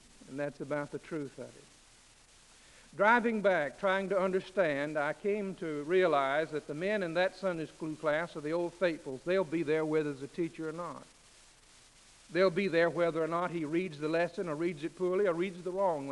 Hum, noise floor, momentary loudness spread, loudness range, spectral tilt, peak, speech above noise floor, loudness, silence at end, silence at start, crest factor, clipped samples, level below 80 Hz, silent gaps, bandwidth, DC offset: none; -61 dBFS; 11 LU; 4 LU; -6 dB/octave; -14 dBFS; 28 dB; -32 LUFS; 0 s; 0.2 s; 20 dB; under 0.1%; -68 dBFS; none; 11.5 kHz; under 0.1%